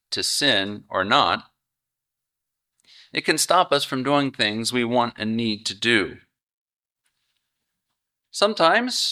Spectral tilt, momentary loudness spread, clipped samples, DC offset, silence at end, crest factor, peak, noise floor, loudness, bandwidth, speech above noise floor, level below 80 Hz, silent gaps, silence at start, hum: -3 dB/octave; 8 LU; under 0.1%; under 0.1%; 0 s; 22 dB; -2 dBFS; -84 dBFS; -21 LUFS; 16 kHz; 63 dB; -66 dBFS; 6.43-6.47 s, 6.53-6.77 s; 0.1 s; none